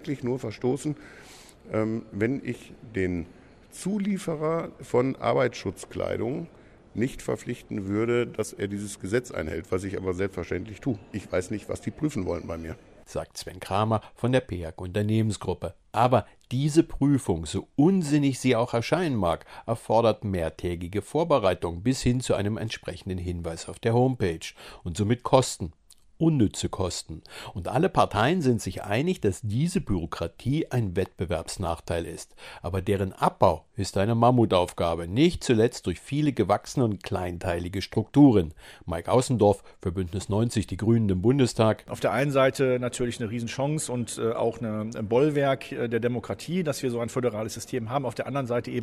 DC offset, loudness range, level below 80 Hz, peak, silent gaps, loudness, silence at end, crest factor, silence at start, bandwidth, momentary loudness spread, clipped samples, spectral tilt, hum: under 0.1%; 6 LU; -48 dBFS; -4 dBFS; none; -27 LUFS; 0 s; 22 dB; 0 s; 15 kHz; 12 LU; under 0.1%; -6 dB/octave; none